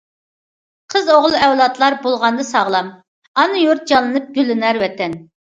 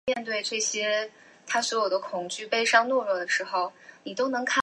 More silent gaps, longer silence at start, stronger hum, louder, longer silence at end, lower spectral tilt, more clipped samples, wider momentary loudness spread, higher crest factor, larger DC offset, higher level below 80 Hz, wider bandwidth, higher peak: first, 3.08-3.35 s vs none; first, 0.9 s vs 0.05 s; neither; first, -15 LUFS vs -26 LUFS; first, 0.25 s vs 0 s; first, -4 dB/octave vs -1 dB/octave; neither; second, 8 LU vs 11 LU; about the same, 16 dB vs 20 dB; neither; first, -60 dBFS vs -76 dBFS; second, 9.2 kHz vs 11.5 kHz; first, 0 dBFS vs -8 dBFS